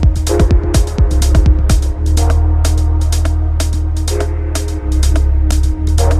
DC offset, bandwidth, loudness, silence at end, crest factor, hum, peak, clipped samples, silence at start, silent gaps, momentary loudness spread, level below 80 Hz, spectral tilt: under 0.1%; 14 kHz; -14 LUFS; 0 s; 10 dB; none; 0 dBFS; under 0.1%; 0 s; none; 5 LU; -12 dBFS; -6 dB/octave